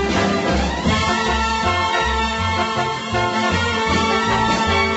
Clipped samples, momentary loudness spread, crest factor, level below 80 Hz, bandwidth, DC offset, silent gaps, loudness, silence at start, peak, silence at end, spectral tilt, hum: under 0.1%; 3 LU; 12 dB; -32 dBFS; 8.2 kHz; under 0.1%; none; -18 LUFS; 0 s; -6 dBFS; 0 s; -4.5 dB/octave; none